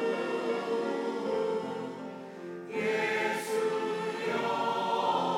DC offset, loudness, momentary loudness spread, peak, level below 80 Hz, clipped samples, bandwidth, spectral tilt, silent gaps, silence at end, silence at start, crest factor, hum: under 0.1%; -31 LUFS; 11 LU; -18 dBFS; -84 dBFS; under 0.1%; 16 kHz; -4.5 dB/octave; none; 0 s; 0 s; 14 dB; none